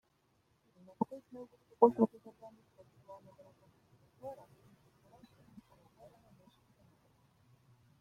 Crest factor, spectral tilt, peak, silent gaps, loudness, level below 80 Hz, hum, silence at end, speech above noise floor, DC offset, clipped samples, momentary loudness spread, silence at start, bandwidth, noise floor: 30 dB; -9.5 dB/octave; -10 dBFS; none; -33 LUFS; -80 dBFS; none; 3.65 s; 38 dB; under 0.1%; under 0.1%; 28 LU; 1 s; 6.6 kHz; -75 dBFS